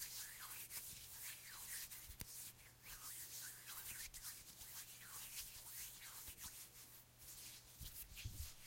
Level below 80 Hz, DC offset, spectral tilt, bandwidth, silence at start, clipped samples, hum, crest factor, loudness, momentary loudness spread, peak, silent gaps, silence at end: -66 dBFS; under 0.1%; -0.5 dB/octave; 16.5 kHz; 0 s; under 0.1%; none; 26 dB; -52 LUFS; 6 LU; -30 dBFS; none; 0 s